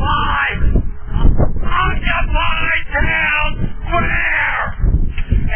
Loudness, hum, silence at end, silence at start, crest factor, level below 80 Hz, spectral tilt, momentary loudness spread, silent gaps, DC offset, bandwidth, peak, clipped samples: -17 LUFS; none; 0 s; 0 s; 14 dB; -18 dBFS; -9 dB/octave; 6 LU; none; under 0.1%; 3.4 kHz; 0 dBFS; under 0.1%